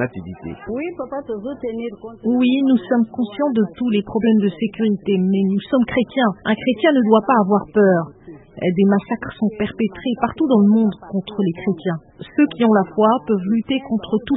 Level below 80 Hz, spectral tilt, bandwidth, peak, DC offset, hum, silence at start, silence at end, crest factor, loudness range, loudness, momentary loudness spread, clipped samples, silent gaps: -52 dBFS; -12 dB/octave; 4 kHz; -2 dBFS; under 0.1%; none; 0 s; 0 s; 16 dB; 3 LU; -19 LUFS; 11 LU; under 0.1%; none